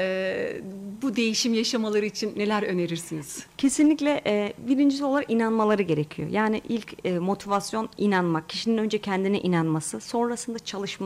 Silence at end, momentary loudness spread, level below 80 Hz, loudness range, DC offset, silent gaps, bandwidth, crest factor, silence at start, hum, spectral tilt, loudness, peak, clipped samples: 0 s; 9 LU; -62 dBFS; 2 LU; under 0.1%; none; 15 kHz; 14 dB; 0 s; none; -5 dB/octave; -25 LUFS; -12 dBFS; under 0.1%